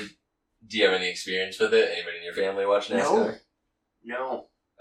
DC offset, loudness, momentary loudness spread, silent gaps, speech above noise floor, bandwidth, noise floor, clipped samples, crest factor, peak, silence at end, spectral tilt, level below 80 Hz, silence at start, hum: under 0.1%; -26 LUFS; 13 LU; none; 53 dB; 12.5 kHz; -78 dBFS; under 0.1%; 20 dB; -8 dBFS; 0.35 s; -3 dB/octave; -72 dBFS; 0 s; none